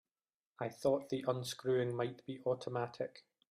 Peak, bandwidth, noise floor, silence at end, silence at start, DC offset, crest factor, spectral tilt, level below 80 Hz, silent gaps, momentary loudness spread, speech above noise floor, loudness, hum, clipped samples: -22 dBFS; 15 kHz; under -90 dBFS; 0.3 s; 0.6 s; under 0.1%; 18 dB; -6 dB/octave; -76 dBFS; none; 10 LU; over 52 dB; -39 LUFS; none; under 0.1%